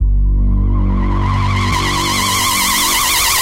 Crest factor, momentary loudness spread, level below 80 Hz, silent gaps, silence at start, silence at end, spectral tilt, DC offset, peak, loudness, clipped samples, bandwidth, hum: 12 dB; 5 LU; -18 dBFS; none; 0 s; 0 s; -2.5 dB/octave; under 0.1%; 0 dBFS; -14 LUFS; under 0.1%; 16 kHz; none